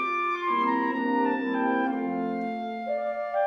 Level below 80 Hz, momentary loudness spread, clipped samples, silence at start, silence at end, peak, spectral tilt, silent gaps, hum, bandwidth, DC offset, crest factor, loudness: -72 dBFS; 6 LU; under 0.1%; 0 s; 0 s; -14 dBFS; -7 dB/octave; none; none; 6.2 kHz; under 0.1%; 14 dB; -27 LUFS